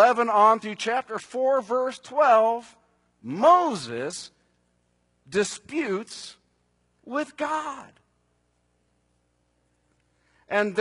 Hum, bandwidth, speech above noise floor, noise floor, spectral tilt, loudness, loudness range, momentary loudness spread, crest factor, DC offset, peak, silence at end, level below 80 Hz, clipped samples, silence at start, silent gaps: 60 Hz at -65 dBFS; 11 kHz; 46 dB; -70 dBFS; -4 dB/octave; -24 LUFS; 12 LU; 18 LU; 20 dB; under 0.1%; -6 dBFS; 0 s; -72 dBFS; under 0.1%; 0 s; none